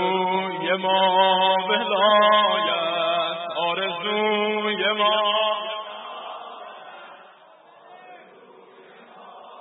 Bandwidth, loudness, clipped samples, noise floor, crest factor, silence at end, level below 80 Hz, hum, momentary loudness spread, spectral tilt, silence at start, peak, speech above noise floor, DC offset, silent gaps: 4.1 kHz; -21 LUFS; under 0.1%; -50 dBFS; 18 dB; 0 s; -86 dBFS; none; 19 LU; -8 dB/octave; 0 s; -6 dBFS; 32 dB; under 0.1%; none